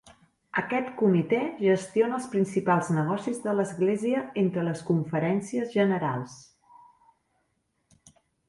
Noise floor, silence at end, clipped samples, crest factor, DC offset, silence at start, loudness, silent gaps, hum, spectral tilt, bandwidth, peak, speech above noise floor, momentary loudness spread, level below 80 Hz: -75 dBFS; 2.1 s; under 0.1%; 18 dB; under 0.1%; 0.05 s; -27 LUFS; none; none; -7 dB/octave; 11.5 kHz; -10 dBFS; 49 dB; 6 LU; -68 dBFS